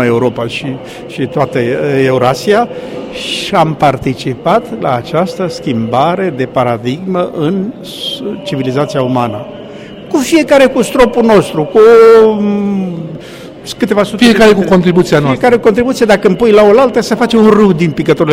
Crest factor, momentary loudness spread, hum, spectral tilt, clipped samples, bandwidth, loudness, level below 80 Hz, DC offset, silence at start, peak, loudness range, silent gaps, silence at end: 10 dB; 14 LU; none; -6 dB/octave; 1%; 16 kHz; -10 LUFS; -40 dBFS; under 0.1%; 0 s; 0 dBFS; 7 LU; none; 0 s